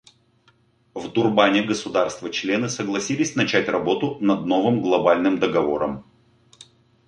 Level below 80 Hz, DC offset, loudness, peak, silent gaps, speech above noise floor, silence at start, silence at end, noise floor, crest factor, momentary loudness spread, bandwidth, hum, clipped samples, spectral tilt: -60 dBFS; under 0.1%; -21 LUFS; -2 dBFS; none; 39 dB; 0.95 s; 1.05 s; -60 dBFS; 20 dB; 9 LU; 10.5 kHz; none; under 0.1%; -4.5 dB/octave